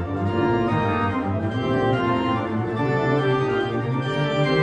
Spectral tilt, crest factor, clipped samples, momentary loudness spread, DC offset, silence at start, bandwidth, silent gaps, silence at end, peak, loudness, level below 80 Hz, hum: -8 dB/octave; 12 dB; under 0.1%; 4 LU; under 0.1%; 0 s; 9.8 kHz; none; 0 s; -8 dBFS; -22 LUFS; -48 dBFS; none